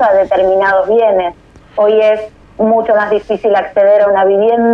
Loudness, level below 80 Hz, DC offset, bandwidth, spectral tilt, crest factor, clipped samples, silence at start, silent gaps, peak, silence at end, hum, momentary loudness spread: -11 LUFS; -46 dBFS; under 0.1%; 6.2 kHz; -7 dB/octave; 8 dB; under 0.1%; 0 s; none; -2 dBFS; 0 s; none; 7 LU